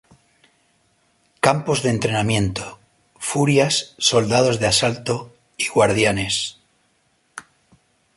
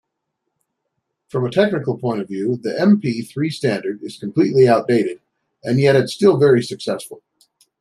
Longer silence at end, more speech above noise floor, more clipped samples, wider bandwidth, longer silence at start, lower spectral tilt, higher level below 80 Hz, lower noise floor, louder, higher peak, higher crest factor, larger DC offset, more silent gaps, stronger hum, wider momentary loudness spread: about the same, 0.75 s vs 0.65 s; second, 45 dB vs 59 dB; neither; second, 11.5 kHz vs 13 kHz; about the same, 1.45 s vs 1.35 s; second, -4 dB/octave vs -7 dB/octave; first, -48 dBFS vs -62 dBFS; second, -64 dBFS vs -76 dBFS; about the same, -19 LUFS vs -18 LUFS; about the same, 0 dBFS vs -2 dBFS; about the same, 20 dB vs 16 dB; neither; neither; neither; first, 17 LU vs 13 LU